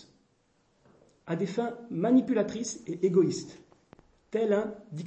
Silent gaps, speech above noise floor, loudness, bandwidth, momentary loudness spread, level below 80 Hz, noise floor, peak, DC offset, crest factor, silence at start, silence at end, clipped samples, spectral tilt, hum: none; 41 dB; -29 LUFS; 8.6 kHz; 12 LU; -70 dBFS; -70 dBFS; -12 dBFS; under 0.1%; 18 dB; 1.3 s; 0 s; under 0.1%; -6 dB/octave; none